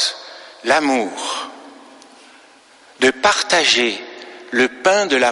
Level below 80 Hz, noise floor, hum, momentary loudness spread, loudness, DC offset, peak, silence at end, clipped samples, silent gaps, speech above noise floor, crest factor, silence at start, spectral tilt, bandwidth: -60 dBFS; -48 dBFS; none; 19 LU; -16 LUFS; under 0.1%; -2 dBFS; 0 s; under 0.1%; none; 32 dB; 18 dB; 0 s; -1.5 dB/octave; 11.5 kHz